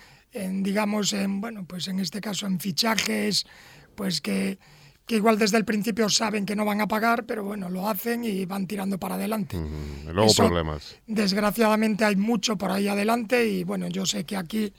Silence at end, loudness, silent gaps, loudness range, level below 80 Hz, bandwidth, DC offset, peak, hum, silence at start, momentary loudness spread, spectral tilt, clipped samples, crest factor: 0.1 s; -25 LUFS; none; 4 LU; -52 dBFS; 17.5 kHz; under 0.1%; -2 dBFS; none; 0 s; 10 LU; -4 dB/octave; under 0.1%; 22 dB